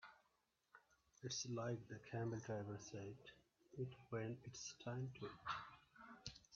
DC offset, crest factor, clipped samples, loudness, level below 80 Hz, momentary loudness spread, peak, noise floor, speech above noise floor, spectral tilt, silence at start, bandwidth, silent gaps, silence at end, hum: under 0.1%; 20 dB; under 0.1%; -50 LUFS; -78 dBFS; 15 LU; -32 dBFS; -85 dBFS; 35 dB; -5 dB/octave; 0 s; 7.2 kHz; none; 0 s; none